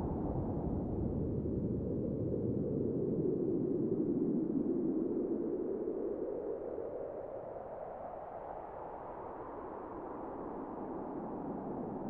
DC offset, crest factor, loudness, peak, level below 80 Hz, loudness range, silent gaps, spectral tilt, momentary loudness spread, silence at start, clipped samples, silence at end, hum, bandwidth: under 0.1%; 16 dB; -38 LUFS; -22 dBFS; -54 dBFS; 10 LU; none; -12 dB/octave; 11 LU; 0 s; under 0.1%; 0 s; none; 3 kHz